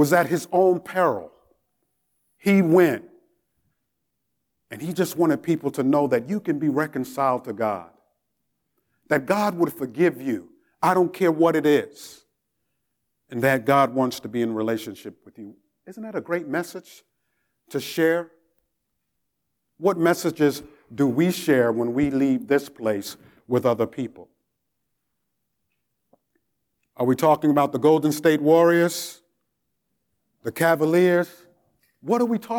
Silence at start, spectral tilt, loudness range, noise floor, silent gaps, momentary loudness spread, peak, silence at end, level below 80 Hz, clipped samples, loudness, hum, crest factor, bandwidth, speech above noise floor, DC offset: 0 s; -6 dB/octave; 8 LU; -79 dBFS; none; 15 LU; -6 dBFS; 0 s; -66 dBFS; under 0.1%; -22 LUFS; none; 18 dB; 20 kHz; 57 dB; under 0.1%